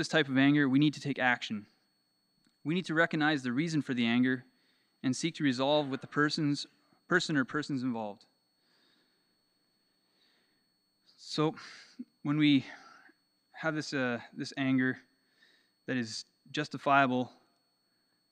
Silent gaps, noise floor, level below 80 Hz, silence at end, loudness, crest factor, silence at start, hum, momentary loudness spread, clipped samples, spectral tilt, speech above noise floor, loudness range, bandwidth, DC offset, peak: none; -76 dBFS; -84 dBFS; 1.05 s; -31 LUFS; 22 dB; 0 s; 60 Hz at -65 dBFS; 16 LU; under 0.1%; -5.5 dB/octave; 45 dB; 10 LU; 10.5 kHz; under 0.1%; -10 dBFS